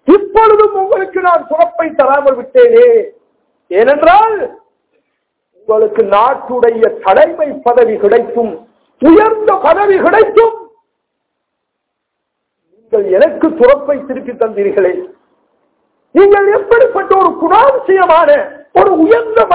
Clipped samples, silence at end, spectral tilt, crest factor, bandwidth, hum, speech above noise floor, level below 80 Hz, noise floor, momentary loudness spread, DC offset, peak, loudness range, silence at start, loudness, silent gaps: 3%; 0 s; -9 dB/octave; 10 dB; 4 kHz; none; 63 dB; -46 dBFS; -72 dBFS; 9 LU; under 0.1%; 0 dBFS; 5 LU; 0.05 s; -9 LUFS; none